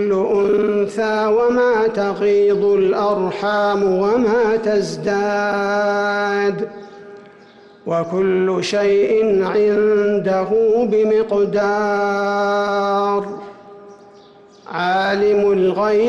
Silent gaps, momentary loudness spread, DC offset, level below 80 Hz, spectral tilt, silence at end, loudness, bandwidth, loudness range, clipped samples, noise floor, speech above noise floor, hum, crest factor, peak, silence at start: none; 5 LU; under 0.1%; -54 dBFS; -6 dB/octave; 0 s; -17 LUFS; 8.8 kHz; 4 LU; under 0.1%; -45 dBFS; 29 dB; none; 8 dB; -8 dBFS; 0 s